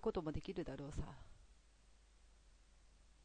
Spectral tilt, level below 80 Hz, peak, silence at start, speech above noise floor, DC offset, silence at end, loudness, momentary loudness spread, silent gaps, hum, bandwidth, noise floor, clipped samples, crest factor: -7 dB/octave; -58 dBFS; -28 dBFS; 0 s; 23 dB; under 0.1%; 0 s; -47 LUFS; 17 LU; none; none; 9.4 kHz; -68 dBFS; under 0.1%; 20 dB